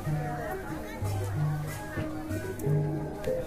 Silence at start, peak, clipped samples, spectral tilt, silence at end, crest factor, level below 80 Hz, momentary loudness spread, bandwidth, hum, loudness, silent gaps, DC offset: 0 s; -16 dBFS; under 0.1%; -7 dB/octave; 0 s; 16 dB; -46 dBFS; 6 LU; 15.5 kHz; none; -33 LUFS; none; under 0.1%